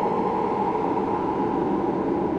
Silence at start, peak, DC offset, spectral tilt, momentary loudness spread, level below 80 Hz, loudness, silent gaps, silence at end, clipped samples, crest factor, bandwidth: 0 s; -12 dBFS; under 0.1%; -8.5 dB/octave; 1 LU; -50 dBFS; -24 LUFS; none; 0 s; under 0.1%; 12 dB; 8.4 kHz